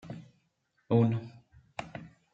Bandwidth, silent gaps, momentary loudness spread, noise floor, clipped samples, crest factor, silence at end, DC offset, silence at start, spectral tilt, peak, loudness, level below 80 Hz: 7.8 kHz; none; 21 LU; -75 dBFS; under 0.1%; 22 dB; 0.25 s; under 0.1%; 0.05 s; -9 dB/octave; -12 dBFS; -30 LUFS; -68 dBFS